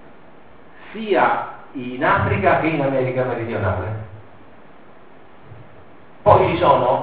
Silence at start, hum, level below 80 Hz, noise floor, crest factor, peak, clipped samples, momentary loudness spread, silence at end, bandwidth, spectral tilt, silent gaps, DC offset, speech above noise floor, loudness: 0.8 s; none; -48 dBFS; -47 dBFS; 20 dB; 0 dBFS; under 0.1%; 17 LU; 0 s; 4.9 kHz; -5 dB/octave; none; 0.8%; 28 dB; -18 LUFS